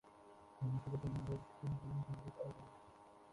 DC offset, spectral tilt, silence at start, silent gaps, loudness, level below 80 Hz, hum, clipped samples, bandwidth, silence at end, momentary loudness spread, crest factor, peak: under 0.1%; -9 dB/octave; 0.05 s; none; -46 LUFS; -64 dBFS; none; under 0.1%; 11 kHz; 0 s; 19 LU; 14 dB; -32 dBFS